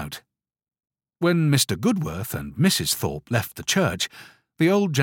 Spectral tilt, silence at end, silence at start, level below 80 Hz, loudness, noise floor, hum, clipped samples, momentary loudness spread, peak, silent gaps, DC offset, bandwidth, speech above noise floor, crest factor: -4.5 dB/octave; 0 s; 0 s; -52 dBFS; -23 LUFS; -61 dBFS; none; under 0.1%; 10 LU; -4 dBFS; none; under 0.1%; 17 kHz; 39 dB; 18 dB